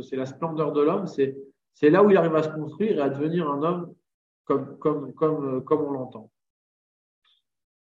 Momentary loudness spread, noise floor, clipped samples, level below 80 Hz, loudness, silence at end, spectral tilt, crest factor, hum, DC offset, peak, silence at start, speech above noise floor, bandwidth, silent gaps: 13 LU; under -90 dBFS; under 0.1%; -72 dBFS; -24 LUFS; 1.65 s; -8.5 dB/octave; 20 dB; none; under 0.1%; -6 dBFS; 0 s; over 66 dB; 7.4 kHz; 4.14-4.45 s